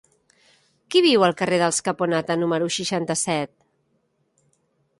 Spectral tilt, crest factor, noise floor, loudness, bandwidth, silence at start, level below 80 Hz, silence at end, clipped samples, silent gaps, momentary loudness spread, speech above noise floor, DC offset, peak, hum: -3.5 dB/octave; 18 dB; -69 dBFS; -21 LUFS; 11.5 kHz; 0.9 s; -68 dBFS; 1.55 s; under 0.1%; none; 7 LU; 48 dB; under 0.1%; -4 dBFS; none